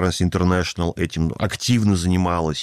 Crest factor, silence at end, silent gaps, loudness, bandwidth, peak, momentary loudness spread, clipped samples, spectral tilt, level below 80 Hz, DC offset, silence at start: 12 dB; 0 s; none; -20 LUFS; 14.5 kHz; -8 dBFS; 5 LU; under 0.1%; -5.5 dB/octave; -38 dBFS; 0.2%; 0 s